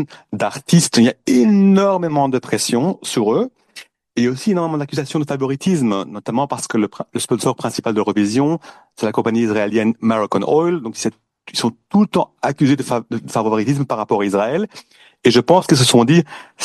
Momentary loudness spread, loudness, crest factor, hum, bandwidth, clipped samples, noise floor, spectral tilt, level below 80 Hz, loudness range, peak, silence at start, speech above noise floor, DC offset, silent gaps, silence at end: 11 LU; -17 LUFS; 16 dB; none; 12.5 kHz; under 0.1%; -42 dBFS; -5.5 dB/octave; -58 dBFS; 4 LU; 0 dBFS; 0 s; 25 dB; under 0.1%; none; 0 s